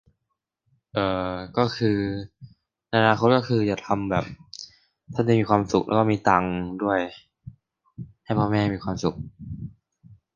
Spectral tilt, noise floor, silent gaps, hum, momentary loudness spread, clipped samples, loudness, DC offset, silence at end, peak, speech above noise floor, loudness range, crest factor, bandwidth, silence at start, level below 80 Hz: -7 dB/octave; -80 dBFS; none; none; 20 LU; under 0.1%; -24 LUFS; under 0.1%; 0.2 s; -2 dBFS; 57 dB; 5 LU; 22 dB; 7.4 kHz; 0.95 s; -50 dBFS